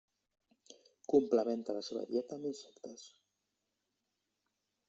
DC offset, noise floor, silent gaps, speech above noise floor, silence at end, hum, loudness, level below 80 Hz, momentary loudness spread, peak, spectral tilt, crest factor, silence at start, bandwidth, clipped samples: under 0.1%; -86 dBFS; none; 50 dB; 1.8 s; none; -35 LUFS; -82 dBFS; 21 LU; -16 dBFS; -5.5 dB/octave; 24 dB; 0.7 s; 7.8 kHz; under 0.1%